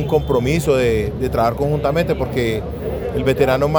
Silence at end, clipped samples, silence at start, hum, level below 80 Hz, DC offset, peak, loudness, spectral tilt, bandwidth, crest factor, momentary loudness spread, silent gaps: 0 s; under 0.1%; 0 s; none; -32 dBFS; under 0.1%; -2 dBFS; -18 LUFS; -6.5 dB/octave; over 20 kHz; 16 dB; 6 LU; none